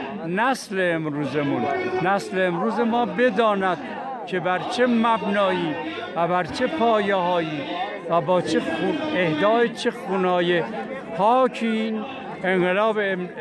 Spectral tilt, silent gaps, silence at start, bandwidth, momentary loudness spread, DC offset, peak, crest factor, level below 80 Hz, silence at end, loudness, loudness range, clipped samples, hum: -6 dB/octave; none; 0 s; 12 kHz; 8 LU; under 0.1%; -8 dBFS; 14 dB; -66 dBFS; 0 s; -22 LUFS; 1 LU; under 0.1%; none